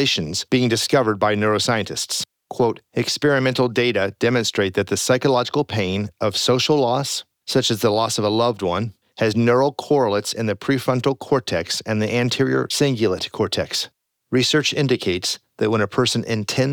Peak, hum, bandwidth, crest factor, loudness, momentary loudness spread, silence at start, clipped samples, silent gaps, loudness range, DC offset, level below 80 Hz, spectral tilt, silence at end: -4 dBFS; none; over 20 kHz; 16 dB; -20 LUFS; 6 LU; 0 s; under 0.1%; none; 1 LU; under 0.1%; -56 dBFS; -4.5 dB/octave; 0 s